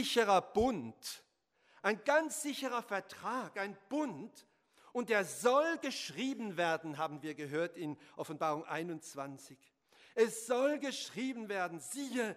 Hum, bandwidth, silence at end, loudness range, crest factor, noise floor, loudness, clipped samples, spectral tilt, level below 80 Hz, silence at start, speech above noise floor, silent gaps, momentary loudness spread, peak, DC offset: none; 15.5 kHz; 0 s; 4 LU; 20 dB; -73 dBFS; -36 LUFS; under 0.1%; -3.5 dB/octave; -66 dBFS; 0 s; 37 dB; none; 14 LU; -16 dBFS; under 0.1%